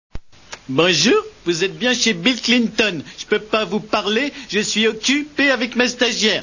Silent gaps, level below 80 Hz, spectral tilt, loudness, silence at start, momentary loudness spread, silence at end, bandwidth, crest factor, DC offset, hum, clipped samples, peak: none; -48 dBFS; -3 dB/octave; -17 LUFS; 0.15 s; 7 LU; 0 s; 7.4 kHz; 18 dB; under 0.1%; none; under 0.1%; 0 dBFS